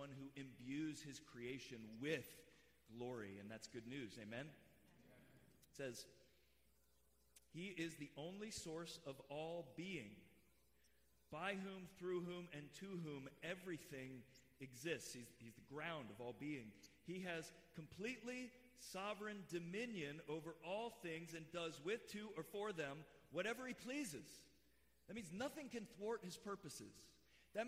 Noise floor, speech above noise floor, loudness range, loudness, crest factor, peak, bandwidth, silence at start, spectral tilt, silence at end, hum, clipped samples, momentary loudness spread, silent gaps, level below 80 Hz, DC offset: -79 dBFS; 28 dB; 6 LU; -51 LUFS; 20 dB; -32 dBFS; 15.5 kHz; 0 s; -4.5 dB/octave; 0 s; none; under 0.1%; 12 LU; none; -80 dBFS; under 0.1%